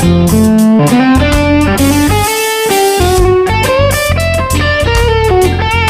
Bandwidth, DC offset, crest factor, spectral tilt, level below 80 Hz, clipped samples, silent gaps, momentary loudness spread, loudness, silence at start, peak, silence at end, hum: 16 kHz; under 0.1%; 8 dB; -5 dB/octave; -20 dBFS; under 0.1%; none; 3 LU; -9 LUFS; 0 s; 0 dBFS; 0 s; none